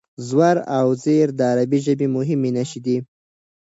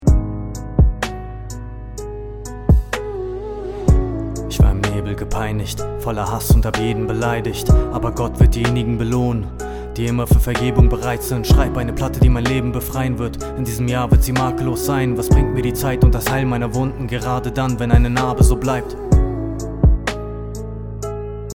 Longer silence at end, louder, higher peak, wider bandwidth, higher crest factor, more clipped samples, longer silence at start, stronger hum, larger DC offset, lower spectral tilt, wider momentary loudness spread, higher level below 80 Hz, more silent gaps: first, 0.6 s vs 0.05 s; about the same, -19 LUFS vs -19 LUFS; second, -4 dBFS vs 0 dBFS; second, 8 kHz vs 19 kHz; about the same, 16 dB vs 16 dB; neither; first, 0.2 s vs 0 s; neither; neither; about the same, -7 dB/octave vs -6.5 dB/octave; second, 7 LU vs 12 LU; second, -66 dBFS vs -20 dBFS; neither